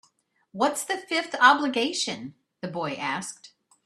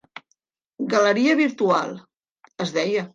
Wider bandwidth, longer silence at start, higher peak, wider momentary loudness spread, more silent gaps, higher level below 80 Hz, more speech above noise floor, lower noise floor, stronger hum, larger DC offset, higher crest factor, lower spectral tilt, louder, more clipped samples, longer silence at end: first, 14 kHz vs 9.4 kHz; second, 0.55 s vs 0.8 s; about the same, -4 dBFS vs -6 dBFS; first, 20 LU vs 14 LU; second, none vs 2.31-2.35 s; about the same, -74 dBFS vs -74 dBFS; second, 42 dB vs 50 dB; about the same, -68 dBFS vs -71 dBFS; neither; neither; first, 24 dB vs 18 dB; second, -2.5 dB/octave vs -5 dB/octave; second, -25 LUFS vs -21 LUFS; neither; first, 0.4 s vs 0.05 s